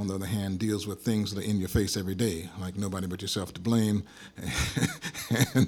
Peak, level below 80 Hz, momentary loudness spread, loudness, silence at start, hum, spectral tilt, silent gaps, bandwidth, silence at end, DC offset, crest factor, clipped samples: -8 dBFS; -46 dBFS; 7 LU; -30 LUFS; 0 s; none; -5 dB/octave; none; 19.5 kHz; 0 s; under 0.1%; 20 dB; under 0.1%